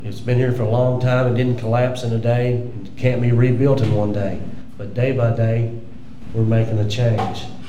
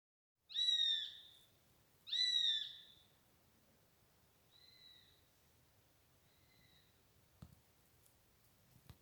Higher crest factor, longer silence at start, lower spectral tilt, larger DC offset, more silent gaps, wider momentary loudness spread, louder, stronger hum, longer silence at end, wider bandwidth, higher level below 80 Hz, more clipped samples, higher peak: second, 14 dB vs 20 dB; second, 0 s vs 0.5 s; first, -8 dB/octave vs 0.5 dB/octave; first, 4% vs under 0.1%; neither; second, 12 LU vs 24 LU; first, -19 LUFS vs -36 LUFS; neither; about the same, 0 s vs 0.1 s; second, 8 kHz vs over 20 kHz; first, -46 dBFS vs -82 dBFS; neither; first, -4 dBFS vs -26 dBFS